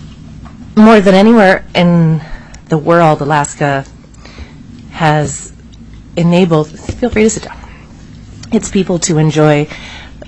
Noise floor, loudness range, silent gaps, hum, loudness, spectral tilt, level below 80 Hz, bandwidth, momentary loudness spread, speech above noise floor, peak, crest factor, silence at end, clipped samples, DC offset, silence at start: -33 dBFS; 6 LU; none; none; -11 LUFS; -6 dB/octave; -36 dBFS; 10 kHz; 22 LU; 24 dB; 0 dBFS; 12 dB; 0 s; 0.1%; under 0.1%; 0 s